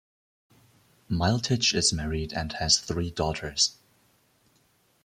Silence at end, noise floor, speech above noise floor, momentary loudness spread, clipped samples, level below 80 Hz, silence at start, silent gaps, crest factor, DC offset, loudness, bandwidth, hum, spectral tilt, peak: 1.3 s; -66 dBFS; 40 dB; 9 LU; under 0.1%; -46 dBFS; 1.1 s; none; 22 dB; under 0.1%; -26 LUFS; 15 kHz; none; -3 dB/octave; -8 dBFS